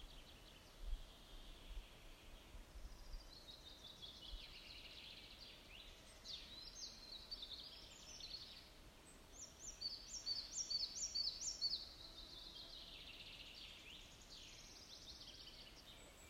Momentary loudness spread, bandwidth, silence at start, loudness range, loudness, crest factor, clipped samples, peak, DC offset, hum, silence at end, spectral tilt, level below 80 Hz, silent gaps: 18 LU; 16 kHz; 0 s; 13 LU; -50 LUFS; 22 dB; under 0.1%; -32 dBFS; under 0.1%; none; 0 s; -0.5 dB/octave; -60 dBFS; none